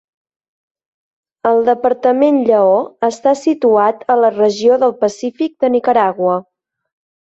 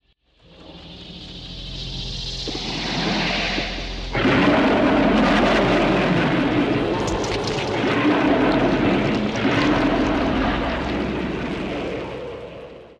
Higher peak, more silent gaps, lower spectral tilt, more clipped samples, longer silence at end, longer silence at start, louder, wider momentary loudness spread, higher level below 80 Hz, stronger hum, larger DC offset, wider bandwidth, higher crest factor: first, -2 dBFS vs -6 dBFS; neither; about the same, -5.5 dB/octave vs -5.5 dB/octave; neither; first, 0.85 s vs 0.05 s; first, 1.45 s vs 0.6 s; first, -14 LUFS vs -20 LUFS; second, 6 LU vs 17 LU; second, -62 dBFS vs -36 dBFS; neither; neither; second, 8 kHz vs 10 kHz; about the same, 14 dB vs 16 dB